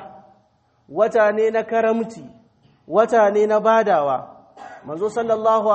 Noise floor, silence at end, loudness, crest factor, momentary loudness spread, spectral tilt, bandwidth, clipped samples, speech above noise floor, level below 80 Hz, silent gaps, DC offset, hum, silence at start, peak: -61 dBFS; 0 s; -18 LUFS; 18 dB; 11 LU; -5.5 dB/octave; 8.4 kHz; under 0.1%; 43 dB; -68 dBFS; none; under 0.1%; none; 0 s; -2 dBFS